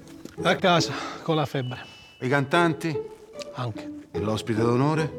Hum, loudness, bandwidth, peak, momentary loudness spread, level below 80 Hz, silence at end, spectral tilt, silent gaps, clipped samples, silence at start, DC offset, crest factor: none; -25 LUFS; 16.5 kHz; -4 dBFS; 17 LU; -62 dBFS; 0 s; -5.5 dB/octave; none; under 0.1%; 0 s; under 0.1%; 20 dB